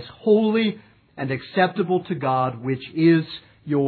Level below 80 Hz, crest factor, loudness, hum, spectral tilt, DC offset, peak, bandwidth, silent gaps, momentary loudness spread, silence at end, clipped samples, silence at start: -64 dBFS; 16 dB; -22 LUFS; none; -10.5 dB/octave; under 0.1%; -6 dBFS; 4.6 kHz; none; 13 LU; 0 s; under 0.1%; 0 s